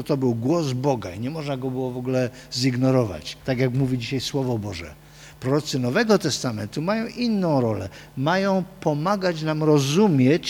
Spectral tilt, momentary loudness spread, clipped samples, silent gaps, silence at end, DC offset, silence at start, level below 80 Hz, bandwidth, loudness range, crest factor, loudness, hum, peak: -6 dB/octave; 9 LU; under 0.1%; none; 0 s; under 0.1%; 0 s; -52 dBFS; 18.5 kHz; 2 LU; 16 dB; -23 LUFS; none; -6 dBFS